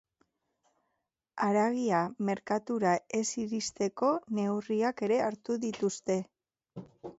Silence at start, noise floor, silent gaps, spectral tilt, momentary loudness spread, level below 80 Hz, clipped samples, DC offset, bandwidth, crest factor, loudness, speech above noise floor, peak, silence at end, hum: 1.35 s; -84 dBFS; none; -5 dB/octave; 11 LU; -74 dBFS; under 0.1%; under 0.1%; 8.2 kHz; 18 dB; -31 LUFS; 53 dB; -14 dBFS; 0.1 s; none